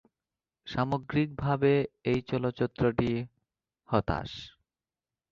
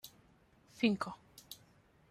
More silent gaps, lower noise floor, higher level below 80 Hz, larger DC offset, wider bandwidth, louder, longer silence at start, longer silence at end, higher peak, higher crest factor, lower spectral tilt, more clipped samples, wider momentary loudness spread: neither; first, under -90 dBFS vs -67 dBFS; first, -52 dBFS vs -74 dBFS; neither; second, 7.2 kHz vs 14.5 kHz; first, -30 LUFS vs -36 LUFS; first, 0.65 s vs 0.05 s; first, 0.8 s vs 0.55 s; first, -10 dBFS vs -18 dBFS; about the same, 22 dB vs 22 dB; first, -8.5 dB/octave vs -5 dB/octave; neither; second, 16 LU vs 20 LU